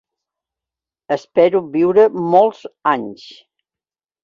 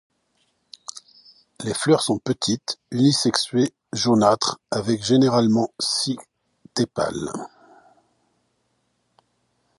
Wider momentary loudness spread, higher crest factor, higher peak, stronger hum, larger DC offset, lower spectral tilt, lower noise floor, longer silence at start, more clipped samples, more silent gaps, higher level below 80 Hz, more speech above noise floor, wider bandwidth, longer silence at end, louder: second, 10 LU vs 17 LU; second, 16 dB vs 22 dB; about the same, -2 dBFS vs -2 dBFS; neither; neither; first, -7.5 dB/octave vs -4.5 dB/octave; first, under -90 dBFS vs -70 dBFS; first, 1.1 s vs 0.95 s; neither; neither; about the same, -62 dBFS vs -60 dBFS; first, over 75 dB vs 49 dB; second, 7 kHz vs 11.5 kHz; second, 1.1 s vs 2.3 s; first, -16 LUFS vs -21 LUFS